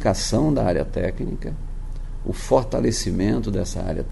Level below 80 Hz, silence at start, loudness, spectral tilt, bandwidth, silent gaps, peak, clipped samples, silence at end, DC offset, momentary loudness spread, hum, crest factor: -30 dBFS; 0 s; -23 LUFS; -5.5 dB/octave; 11.5 kHz; none; -4 dBFS; under 0.1%; 0 s; under 0.1%; 14 LU; none; 18 dB